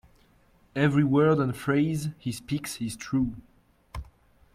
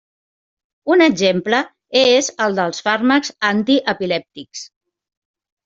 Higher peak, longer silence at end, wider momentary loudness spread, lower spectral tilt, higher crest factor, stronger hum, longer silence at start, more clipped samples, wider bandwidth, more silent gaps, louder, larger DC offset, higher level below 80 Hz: second, -10 dBFS vs -2 dBFS; second, 0.5 s vs 1 s; first, 21 LU vs 16 LU; first, -6.5 dB/octave vs -3.5 dB/octave; about the same, 18 dB vs 16 dB; neither; about the same, 0.75 s vs 0.85 s; neither; first, 15.5 kHz vs 8 kHz; neither; second, -27 LUFS vs -16 LUFS; neither; first, -52 dBFS vs -62 dBFS